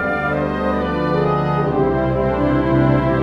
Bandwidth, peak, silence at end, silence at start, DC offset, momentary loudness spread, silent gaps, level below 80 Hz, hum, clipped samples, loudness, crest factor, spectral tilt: 6.2 kHz; -4 dBFS; 0 s; 0 s; under 0.1%; 4 LU; none; -32 dBFS; none; under 0.1%; -18 LUFS; 14 dB; -9 dB/octave